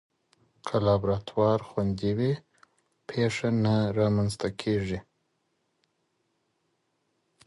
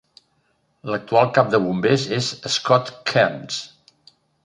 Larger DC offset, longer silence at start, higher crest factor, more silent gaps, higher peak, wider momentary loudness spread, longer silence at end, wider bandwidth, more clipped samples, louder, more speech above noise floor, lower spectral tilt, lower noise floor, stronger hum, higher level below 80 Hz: neither; second, 0.65 s vs 0.85 s; about the same, 18 dB vs 20 dB; neither; second, -12 dBFS vs -2 dBFS; about the same, 10 LU vs 12 LU; first, 2.45 s vs 0.8 s; about the same, 11.5 kHz vs 11.5 kHz; neither; second, -28 LUFS vs -20 LUFS; about the same, 49 dB vs 46 dB; first, -7 dB/octave vs -4.5 dB/octave; first, -75 dBFS vs -66 dBFS; neither; first, -52 dBFS vs -62 dBFS